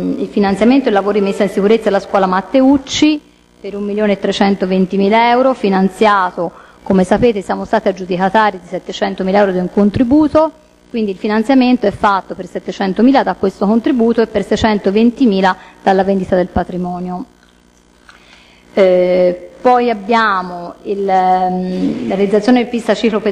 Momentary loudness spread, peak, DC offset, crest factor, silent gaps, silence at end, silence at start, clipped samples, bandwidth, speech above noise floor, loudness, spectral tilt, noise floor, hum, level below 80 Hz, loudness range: 10 LU; 0 dBFS; under 0.1%; 12 dB; none; 0 s; 0 s; under 0.1%; 11.5 kHz; 36 dB; -13 LUFS; -6.5 dB/octave; -48 dBFS; 60 Hz at -40 dBFS; -42 dBFS; 3 LU